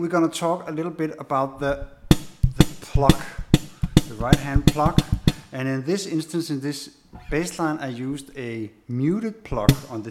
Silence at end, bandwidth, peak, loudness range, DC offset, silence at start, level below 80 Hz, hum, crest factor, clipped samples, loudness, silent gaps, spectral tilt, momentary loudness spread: 0 s; 16.5 kHz; 0 dBFS; 7 LU; under 0.1%; 0 s; -32 dBFS; none; 22 dB; under 0.1%; -24 LUFS; none; -6 dB/octave; 11 LU